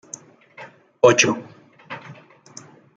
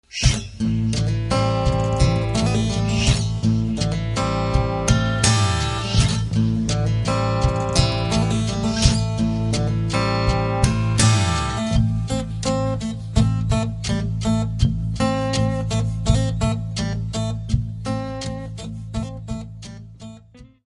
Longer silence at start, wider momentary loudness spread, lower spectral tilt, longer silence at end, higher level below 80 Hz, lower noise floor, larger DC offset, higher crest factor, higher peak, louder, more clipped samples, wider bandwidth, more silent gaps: first, 0.6 s vs 0.1 s; first, 28 LU vs 10 LU; second, -3 dB/octave vs -5.5 dB/octave; first, 0.85 s vs 0.2 s; second, -66 dBFS vs -30 dBFS; about the same, -45 dBFS vs -46 dBFS; neither; about the same, 22 dB vs 20 dB; about the same, 0 dBFS vs -2 dBFS; first, -17 LUFS vs -21 LUFS; neither; second, 9 kHz vs 11.5 kHz; neither